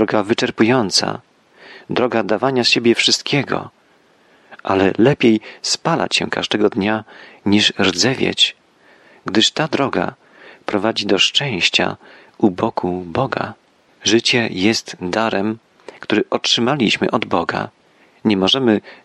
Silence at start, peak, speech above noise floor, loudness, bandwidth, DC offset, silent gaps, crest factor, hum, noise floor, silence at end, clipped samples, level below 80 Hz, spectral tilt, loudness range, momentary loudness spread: 0 s; -2 dBFS; 37 dB; -17 LUFS; 12 kHz; under 0.1%; none; 18 dB; none; -54 dBFS; 0.1 s; under 0.1%; -58 dBFS; -3.5 dB/octave; 2 LU; 11 LU